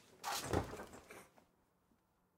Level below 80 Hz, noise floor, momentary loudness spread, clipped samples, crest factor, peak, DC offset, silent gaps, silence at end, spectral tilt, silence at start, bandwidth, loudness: -64 dBFS; -77 dBFS; 18 LU; under 0.1%; 26 dB; -22 dBFS; under 0.1%; none; 1.1 s; -4 dB/octave; 0 s; 16 kHz; -42 LUFS